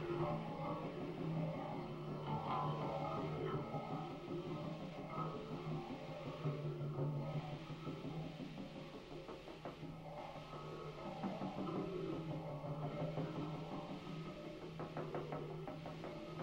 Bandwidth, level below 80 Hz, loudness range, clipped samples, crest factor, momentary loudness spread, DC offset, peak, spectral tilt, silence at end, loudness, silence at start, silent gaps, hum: 9.6 kHz; -66 dBFS; 6 LU; under 0.1%; 16 dB; 8 LU; under 0.1%; -28 dBFS; -8 dB/octave; 0 s; -46 LUFS; 0 s; none; none